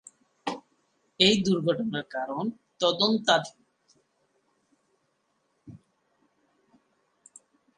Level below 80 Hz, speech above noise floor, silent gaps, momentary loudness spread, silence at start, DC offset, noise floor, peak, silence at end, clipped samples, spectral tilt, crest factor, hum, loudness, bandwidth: -68 dBFS; 49 dB; none; 15 LU; 0.45 s; under 0.1%; -74 dBFS; -6 dBFS; 2 s; under 0.1%; -4 dB/octave; 26 dB; none; -26 LUFS; 10.5 kHz